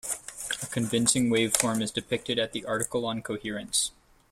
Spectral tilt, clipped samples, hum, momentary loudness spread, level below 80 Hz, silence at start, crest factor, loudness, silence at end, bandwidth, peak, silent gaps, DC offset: -3 dB/octave; under 0.1%; none; 10 LU; -60 dBFS; 0.05 s; 26 dB; -27 LUFS; 0.4 s; 16.5 kHz; -2 dBFS; none; under 0.1%